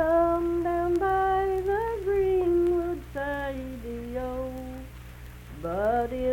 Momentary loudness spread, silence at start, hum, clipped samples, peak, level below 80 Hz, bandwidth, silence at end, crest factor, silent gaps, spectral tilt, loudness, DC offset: 17 LU; 0 s; 60 Hz at -45 dBFS; under 0.1%; -12 dBFS; -42 dBFS; 17 kHz; 0 s; 14 dB; none; -7.5 dB/octave; -27 LUFS; under 0.1%